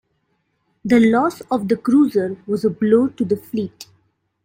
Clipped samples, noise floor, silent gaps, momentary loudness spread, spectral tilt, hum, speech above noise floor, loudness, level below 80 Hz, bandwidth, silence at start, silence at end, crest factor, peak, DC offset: under 0.1%; -68 dBFS; none; 11 LU; -7 dB/octave; none; 51 dB; -18 LUFS; -58 dBFS; 16.5 kHz; 0.85 s; 0.6 s; 16 dB; -2 dBFS; under 0.1%